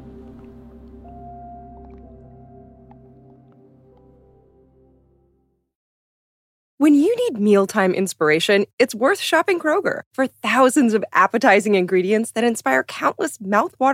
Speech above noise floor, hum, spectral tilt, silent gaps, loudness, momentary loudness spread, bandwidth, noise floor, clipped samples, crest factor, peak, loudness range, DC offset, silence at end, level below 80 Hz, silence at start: 47 dB; none; -4.5 dB/octave; 5.75-6.78 s, 8.73-8.78 s, 10.06-10.11 s; -18 LUFS; 9 LU; 16 kHz; -65 dBFS; under 0.1%; 18 dB; -4 dBFS; 4 LU; under 0.1%; 0 s; -54 dBFS; 0 s